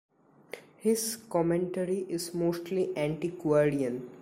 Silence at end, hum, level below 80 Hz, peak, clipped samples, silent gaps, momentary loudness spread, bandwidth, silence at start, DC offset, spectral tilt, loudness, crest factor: 0 s; none; -64 dBFS; -14 dBFS; under 0.1%; none; 8 LU; 16 kHz; 0.55 s; under 0.1%; -5.5 dB/octave; -30 LUFS; 16 dB